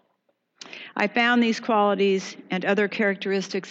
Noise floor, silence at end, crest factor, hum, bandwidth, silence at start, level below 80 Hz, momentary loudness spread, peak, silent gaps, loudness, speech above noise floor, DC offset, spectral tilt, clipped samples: -71 dBFS; 0 s; 16 dB; none; 8 kHz; 0.65 s; -90 dBFS; 11 LU; -8 dBFS; none; -23 LUFS; 49 dB; under 0.1%; -5 dB/octave; under 0.1%